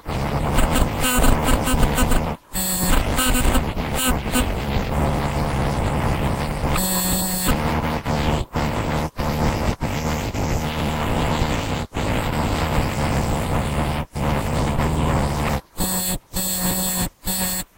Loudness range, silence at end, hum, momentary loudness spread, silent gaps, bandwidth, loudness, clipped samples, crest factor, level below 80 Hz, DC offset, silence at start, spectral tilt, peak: 3 LU; 0.15 s; none; 5 LU; none; 16 kHz; -22 LUFS; under 0.1%; 18 dB; -26 dBFS; under 0.1%; 0.05 s; -4.5 dB/octave; -2 dBFS